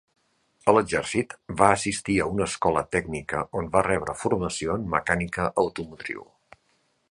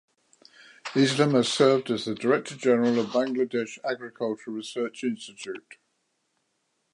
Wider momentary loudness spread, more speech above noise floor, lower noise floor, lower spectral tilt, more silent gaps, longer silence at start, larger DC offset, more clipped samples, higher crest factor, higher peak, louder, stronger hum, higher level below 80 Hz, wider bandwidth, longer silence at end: second, 10 LU vs 15 LU; second, 44 dB vs 50 dB; second, -69 dBFS vs -75 dBFS; about the same, -5 dB/octave vs -5 dB/octave; neither; second, 0.65 s vs 0.85 s; neither; neither; about the same, 24 dB vs 20 dB; first, -2 dBFS vs -8 dBFS; about the same, -25 LUFS vs -26 LUFS; neither; first, -48 dBFS vs -76 dBFS; about the same, 11.5 kHz vs 11 kHz; second, 0.9 s vs 1.35 s